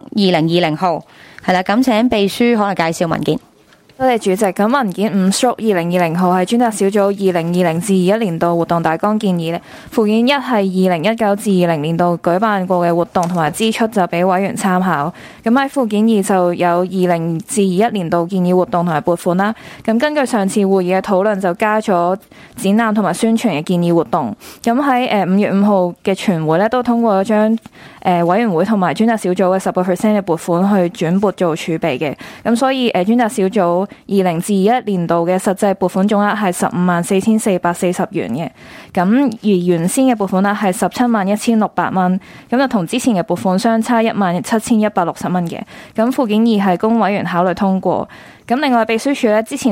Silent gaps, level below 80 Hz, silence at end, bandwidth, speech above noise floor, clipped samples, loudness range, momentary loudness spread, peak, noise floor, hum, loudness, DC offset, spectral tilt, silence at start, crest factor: none; -54 dBFS; 0 s; 16.5 kHz; 33 dB; under 0.1%; 1 LU; 5 LU; -2 dBFS; -48 dBFS; none; -15 LUFS; under 0.1%; -6 dB/octave; 0.15 s; 12 dB